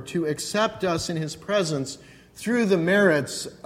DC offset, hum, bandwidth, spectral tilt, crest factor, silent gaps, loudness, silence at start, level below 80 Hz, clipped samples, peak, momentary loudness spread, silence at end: under 0.1%; none; 16.5 kHz; -4.5 dB/octave; 18 dB; none; -24 LUFS; 0 s; -58 dBFS; under 0.1%; -6 dBFS; 12 LU; 0.1 s